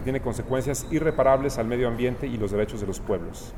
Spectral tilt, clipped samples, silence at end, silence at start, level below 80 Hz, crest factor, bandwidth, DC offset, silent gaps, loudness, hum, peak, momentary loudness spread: -6 dB/octave; under 0.1%; 0 s; 0 s; -38 dBFS; 18 dB; 17.5 kHz; under 0.1%; none; -26 LUFS; none; -8 dBFS; 8 LU